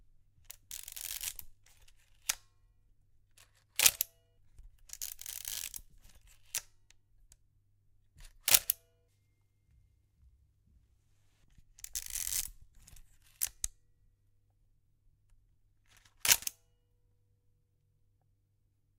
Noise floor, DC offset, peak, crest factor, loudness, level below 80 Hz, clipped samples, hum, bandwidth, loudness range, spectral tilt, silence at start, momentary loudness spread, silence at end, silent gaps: -74 dBFS; under 0.1%; 0 dBFS; 40 dB; -33 LUFS; -62 dBFS; under 0.1%; none; 19 kHz; 10 LU; 2 dB/octave; 0.7 s; 19 LU; 2.45 s; none